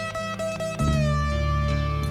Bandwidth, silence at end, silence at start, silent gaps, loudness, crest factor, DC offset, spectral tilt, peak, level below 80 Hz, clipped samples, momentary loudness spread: 14 kHz; 0 s; 0 s; none; -25 LUFS; 12 dB; under 0.1%; -6 dB/octave; -12 dBFS; -30 dBFS; under 0.1%; 6 LU